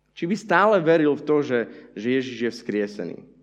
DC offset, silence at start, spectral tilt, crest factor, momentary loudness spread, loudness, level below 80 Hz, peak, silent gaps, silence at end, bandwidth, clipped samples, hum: under 0.1%; 0.15 s; -6.5 dB/octave; 20 dB; 13 LU; -22 LUFS; -70 dBFS; -4 dBFS; none; 0.2 s; 9.4 kHz; under 0.1%; none